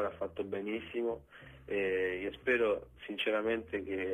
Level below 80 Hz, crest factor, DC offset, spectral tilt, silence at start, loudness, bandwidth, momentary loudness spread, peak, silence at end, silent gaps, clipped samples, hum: -62 dBFS; 16 dB; under 0.1%; -6 dB/octave; 0 s; -35 LUFS; 12.5 kHz; 10 LU; -18 dBFS; 0 s; none; under 0.1%; none